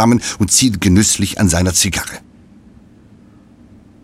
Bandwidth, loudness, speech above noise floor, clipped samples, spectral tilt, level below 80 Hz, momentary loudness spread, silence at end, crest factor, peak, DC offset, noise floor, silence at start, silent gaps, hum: 16.5 kHz; -13 LUFS; 30 dB; under 0.1%; -3.5 dB/octave; -36 dBFS; 10 LU; 1.85 s; 16 dB; 0 dBFS; under 0.1%; -44 dBFS; 0 s; none; none